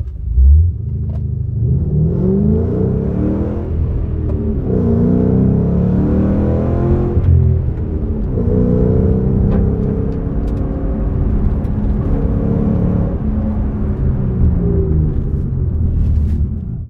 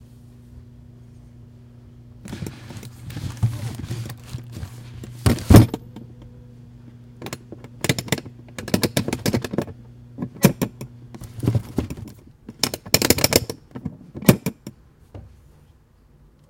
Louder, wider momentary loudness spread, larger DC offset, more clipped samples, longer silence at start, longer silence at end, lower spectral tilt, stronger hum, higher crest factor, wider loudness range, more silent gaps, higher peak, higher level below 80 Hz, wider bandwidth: first, -16 LUFS vs -21 LUFS; second, 7 LU vs 25 LU; neither; neither; second, 0 s vs 0.55 s; second, 0 s vs 1.2 s; first, -12.5 dB/octave vs -5 dB/octave; neither; second, 12 dB vs 24 dB; second, 3 LU vs 11 LU; neither; about the same, -2 dBFS vs 0 dBFS; first, -18 dBFS vs -36 dBFS; second, 2.9 kHz vs 17 kHz